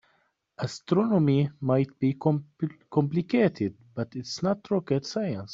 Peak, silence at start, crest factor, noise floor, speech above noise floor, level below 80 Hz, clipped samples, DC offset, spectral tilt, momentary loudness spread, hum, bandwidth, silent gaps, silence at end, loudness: -8 dBFS; 0.6 s; 18 dB; -70 dBFS; 44 dB; -66 dBFS; under 0.1%; under 0.1%; -7.5 dB/octave; 11 LU; none; 7.8 kHz; none; 0 s; -27 LUFS